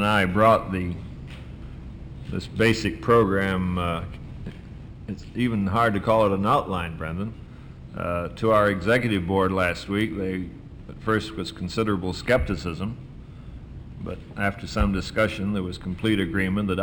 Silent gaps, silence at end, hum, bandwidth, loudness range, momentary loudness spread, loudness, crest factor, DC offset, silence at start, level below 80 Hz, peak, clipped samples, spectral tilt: none; 0 s; none; over 20 kHz; 4 LU; 20 LU; -24 LUFS; 18 dB; under 0.1%; 0 s; -40 dBFS; -6 dBFS; under 0.1%; -6.5 dB/octave